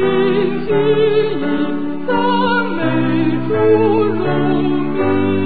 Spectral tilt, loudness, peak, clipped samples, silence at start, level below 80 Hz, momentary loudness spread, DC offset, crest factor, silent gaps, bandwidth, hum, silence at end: -12 dB/octave; -16 LUFS; -2 dBFS; under 0.1%; 0 s; -46 dBFS; 5 LU; 6%; 12 dB; none; 4.8 kHz; none; 0 s